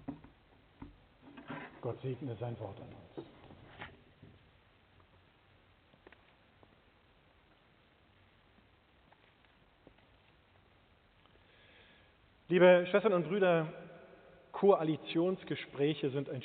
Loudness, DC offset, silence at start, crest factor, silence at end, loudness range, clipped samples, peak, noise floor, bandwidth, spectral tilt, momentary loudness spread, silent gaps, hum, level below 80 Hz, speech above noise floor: -32 LUFS; under 0.1%; 0.1 s; 24 dB; 0 s; 19 LU; under 0.1%; -14 dBFS; -67 dBFS; 4.5 kHz; -5 dB/octave; 29 LU; none; none; -72 dBFS; 36 dB